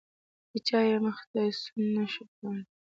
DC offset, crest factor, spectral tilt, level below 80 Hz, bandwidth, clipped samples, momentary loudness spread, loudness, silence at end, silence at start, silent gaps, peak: under 0.1%; 18 dB; -6 dB/octave; -76 dBFS; 7.8 kHz; under 0.1%; 13 LU; -31 LUFS; 0.25 s; 0.55 s; 1.27-1.34 s, 2.28-2.42 s; -14 dBFS